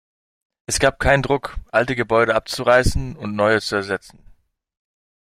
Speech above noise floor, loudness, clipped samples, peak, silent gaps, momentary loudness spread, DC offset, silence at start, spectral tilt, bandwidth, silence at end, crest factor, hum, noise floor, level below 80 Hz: 33 dB; -19 LUFS; under 0.1%; -2 dBFS; none; 11 LU; under 0.1%; 0.7 s; -4.5 dB/octave; 15.5 kHz; 1.4 s; 20 dB; none; -52 dBFS; -34 dBFS